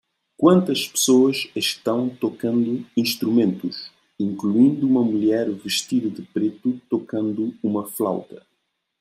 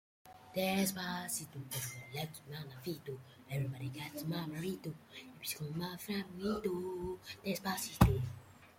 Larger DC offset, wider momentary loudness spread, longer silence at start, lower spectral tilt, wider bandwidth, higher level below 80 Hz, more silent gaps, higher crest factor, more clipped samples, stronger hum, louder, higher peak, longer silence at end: neither; second, 10 LU vs 14 LU; first, 0.4 s vs 0.25 s; about the same, -4.5 dB/octave vs -5 dB/octave; about the same, 16 kHz vs 16.5 kHz; second, -68 dBFS vs -52 dBFS; neither; second, 18 dB vs 28 dB; neither; neither; first, -21 LUFS vs -39 LUFS; first, -2 dBFS vs -10 dBFS; first, 0.65 s vs 0.05 s